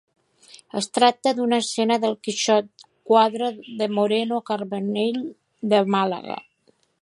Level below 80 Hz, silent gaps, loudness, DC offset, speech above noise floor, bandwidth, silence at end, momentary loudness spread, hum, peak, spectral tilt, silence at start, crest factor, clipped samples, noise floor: -74 dBFS; none; -22 LUFS; under 0.1%; 42 dB; 11.5 kHz; 0.6 s; 13 LU; none; -4 dBFS; -4 dB/octave; 0.75 s; 20 dB; under 0.1%; -64 dBFS